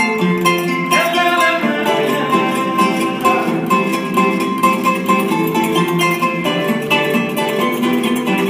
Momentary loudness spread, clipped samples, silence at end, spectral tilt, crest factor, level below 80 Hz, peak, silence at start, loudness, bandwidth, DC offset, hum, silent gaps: 3 LU; under 0.1%; 0 s; -4.5 dB/octave; 14 dB; -58 dBFS; -2 dBFS; 0 s; -15 LUFS; 16 kHz; under 0.1%; none; none